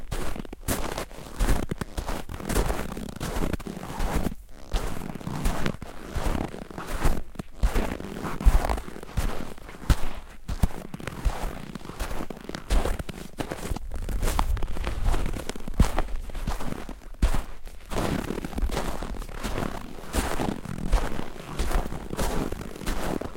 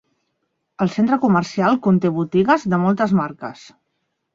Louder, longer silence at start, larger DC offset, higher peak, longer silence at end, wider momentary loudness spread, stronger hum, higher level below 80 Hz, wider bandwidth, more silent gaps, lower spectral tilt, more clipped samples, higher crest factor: second, -32 LUFS vs -18 LUFS; second, 0 s vs 0.8 s; first, 0.2% vs under 0.1%; about the same, -4 dBFS vs -4 dBFS; second, 0 s vs 0.8 s; about the same, 9 LU vs 8 LU; neither; first, -30 dBFS vs -58 dBFS; first, 17 kHz vs 7.6 kHz; neither; second, -5 dB/octave vs -7.5 dB/octave; neither; first, 22 dB vs 16 dB